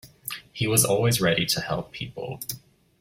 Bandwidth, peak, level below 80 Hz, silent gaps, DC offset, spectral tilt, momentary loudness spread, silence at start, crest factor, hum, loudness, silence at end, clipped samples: 16.5 kHz; -6 dBFS; -54 dBFS; none; under 0.1%; -3.5 dB/octave; 15 LU; 0.05 s; 22 dB; none; -24 LUFS; 0.45 s; under 0.1%